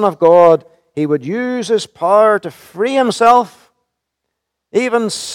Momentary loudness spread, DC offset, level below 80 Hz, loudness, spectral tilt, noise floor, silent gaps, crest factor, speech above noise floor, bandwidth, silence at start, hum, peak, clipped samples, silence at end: 11 LU; under 0.1%; -62 dBFS; -13 LUFS; -4.5 dB/octave; -76 dBFS; none; 14 dB; 63 dB; 13.5 kHz; 0 s; none; 0 dBFS; 0.2%; 0 s